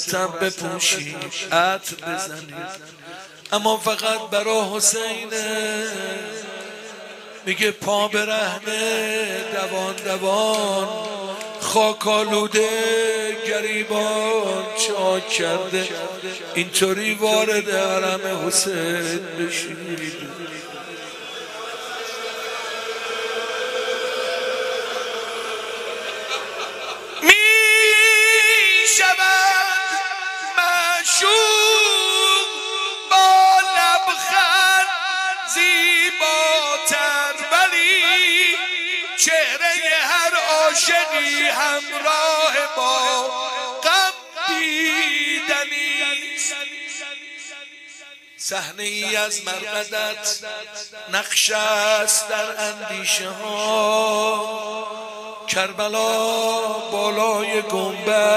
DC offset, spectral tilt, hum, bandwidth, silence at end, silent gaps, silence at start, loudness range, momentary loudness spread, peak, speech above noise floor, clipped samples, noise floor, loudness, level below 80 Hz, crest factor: under 0.1%; -0.5 dB/octave; none; 15.5 kHz; 0 s; none; 0 s; 10 LU; 16 LU; 0 dBFS; 21 dB; under 0.1%; -42 dBFS; -18 LUFS; -68 dBFS; 20 dB